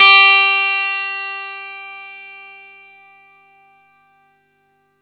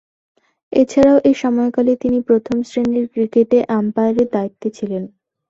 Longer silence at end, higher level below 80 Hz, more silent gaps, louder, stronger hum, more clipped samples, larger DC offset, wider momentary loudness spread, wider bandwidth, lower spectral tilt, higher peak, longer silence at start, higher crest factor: first, 2.55 s vs 0.45 s; second, -84 dBFS vs -52 dBFS; neither; first, -12 LUFS vs -16 LUFS; first, 50 Hz at -75 dBFS vs none; neither; neither; first, 27 LU vs 12 LU; second, 6.6 kHz vs 7.8 kHz; second, 0 dB/octave vs -7 dB/octave; about the same, 0 dBFS vs -2 dBFS; second, 0 s vs 0.7 s; about the same, 18 dB vs 14 dB